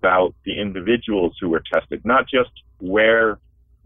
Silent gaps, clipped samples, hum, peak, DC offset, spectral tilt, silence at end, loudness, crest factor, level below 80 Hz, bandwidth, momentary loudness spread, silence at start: none; under 0.1%; none; -6 dBFS; under 0.1%; -8 dB/octave; 0.5 s; -19 LUFS; 14 dB; -48 dBFS; 3.8 kHz; 10 LU; 0.05 s